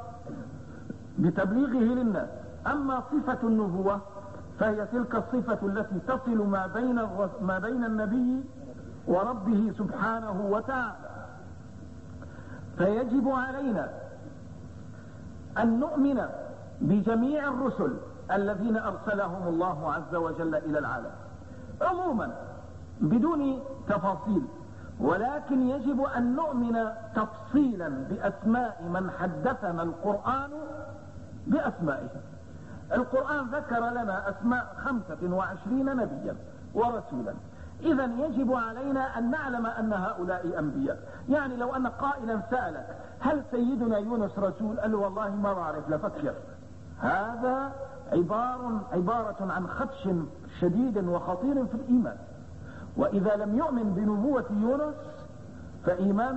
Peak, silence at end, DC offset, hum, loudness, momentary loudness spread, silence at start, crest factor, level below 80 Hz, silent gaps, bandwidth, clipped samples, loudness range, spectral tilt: -14 dBFS; 0 s; 0.3%; none; -29 LUFS; 17 LU; 0 s; 16 dB; -54 dBFS; none; 8.2 kHz; under 0.1%; 3 LU; -8.5 dB/octave